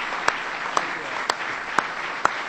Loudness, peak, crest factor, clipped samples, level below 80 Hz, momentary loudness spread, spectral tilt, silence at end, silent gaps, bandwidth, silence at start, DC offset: -25 LUFS; 0 dBFS; 26 dB; under 0.1%; -58 dBFS; 3 LU; -1.5 dB/octave; 0 s; none; 16.5 kHz; 0 s; under 0.1%